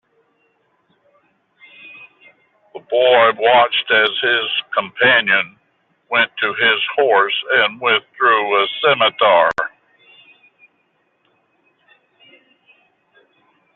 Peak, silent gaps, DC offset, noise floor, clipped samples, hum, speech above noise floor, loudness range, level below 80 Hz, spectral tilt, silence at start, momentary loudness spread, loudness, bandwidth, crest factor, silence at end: -2 dBFS; none; under 0.1%; -64 dBFS; under 0.1%; none; 49 dB; 6 LU; -68 dBFS; 1.5 dB/octave; 1.85 s; 7 LU; -15 LUFS; 6.4 kHz; 16 dB; 4.1 s